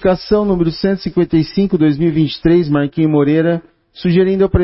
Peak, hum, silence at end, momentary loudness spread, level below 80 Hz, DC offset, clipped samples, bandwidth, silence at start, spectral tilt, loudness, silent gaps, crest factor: 0 dBFS; none; 0 s; 4 LU; -32 dBFS; under 0.1%; under 0.1%; 5.8 kHz; 0 s; -11.5 dB/octave; -14 LUFS; none; 12 dB